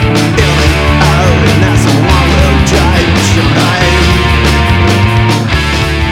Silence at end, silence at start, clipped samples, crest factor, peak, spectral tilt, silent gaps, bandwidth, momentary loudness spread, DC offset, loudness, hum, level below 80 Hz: 0 s; 0 s; 0.6%; 8 dB; 0 dBFS; -5 dB/octave; none; 16 kHz; 2 LU; under 0.1%; -8 LUFS; none; -14 dBFS